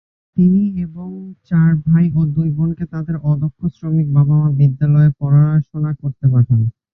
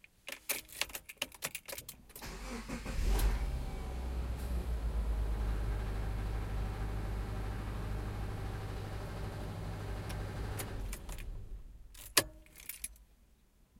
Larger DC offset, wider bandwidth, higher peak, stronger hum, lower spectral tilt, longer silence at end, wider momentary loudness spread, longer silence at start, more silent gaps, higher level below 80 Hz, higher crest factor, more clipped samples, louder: neither; second, 2.5 kHz vs 17 kHz; first, -2 dBFS vs -6 dBFS; neither; first, -13 dB/octave vs -4 dB/octave; second, 0.25 s vs 0.75 s; about the same, 11 LU vs 12 LU; about the same, 0.35 s vs 0.25 s; neither; about the same, -44 dBFS vs -40 dBFS; second, 12 dB vs 32 dB; neither; first, -16 LUFS vs -40 LUFS